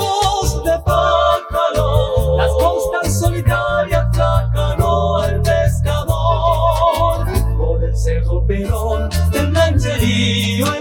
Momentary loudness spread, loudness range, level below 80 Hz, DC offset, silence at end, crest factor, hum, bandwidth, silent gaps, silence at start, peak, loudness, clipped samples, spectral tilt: 4 LU; 1 LU; -22 dBFS; under 0.1%; 0 s; 14 dB; none; 18 kHz; none; 0 s; -2 dBFS; -16 LUFS; under 0.1%; -5.5 dB/octave